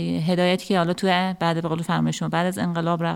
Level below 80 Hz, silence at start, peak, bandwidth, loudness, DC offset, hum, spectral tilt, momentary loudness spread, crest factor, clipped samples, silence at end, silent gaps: -58 dBFS; 0 s; -6 dBFS; 13.5 kHz; -23 LUFS; under 0.1%; none; -6 dB/octave; 3 LU; 16 dB; under 0.1%; 0 s; none